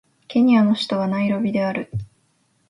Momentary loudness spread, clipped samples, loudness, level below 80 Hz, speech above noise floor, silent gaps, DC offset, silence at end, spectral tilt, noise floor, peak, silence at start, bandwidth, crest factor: 13 LU; under 0.1%; -20 LUFS; -54 dBFS; 46 dB; none; under 0.1%; 0.65 s; -7 dB/octave; -64 dBFS; -6 dBFS; 0.3 s; 11 kHz; 14 dB